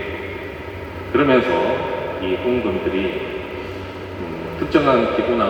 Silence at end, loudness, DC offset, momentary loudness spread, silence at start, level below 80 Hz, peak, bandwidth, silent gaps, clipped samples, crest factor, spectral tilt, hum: 0 s; -21 LUFS; under 0.1%; 15 LU; 0 s; -44 dBFS; -2 dBFS; 19.5 kHz; none; under 0.1%; 18 dB; -7 dB/octave; none